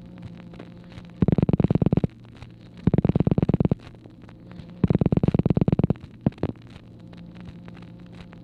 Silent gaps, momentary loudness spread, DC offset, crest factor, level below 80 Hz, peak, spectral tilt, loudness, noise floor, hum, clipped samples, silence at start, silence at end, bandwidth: none; 23 LU; under 0.1%; 18 dB; -40 dBFS; -8 dBFS; -11 dB/octave; -23 LUFS; -45 dBFS; none; under 0.1%; 0.2 s; 0.2 s; 4.9 kHz